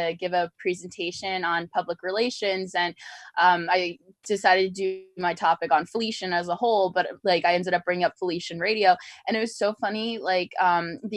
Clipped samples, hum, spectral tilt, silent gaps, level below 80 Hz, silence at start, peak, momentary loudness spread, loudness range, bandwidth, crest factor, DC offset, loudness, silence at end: under 0.1%; none; -4 dB/octave; none; -72 dBFS; 0 s; -4 dBFS; 9 LU; 2 LU; 12 kHz; 20 dB; under 0.1%; -25 LUFS; 0 s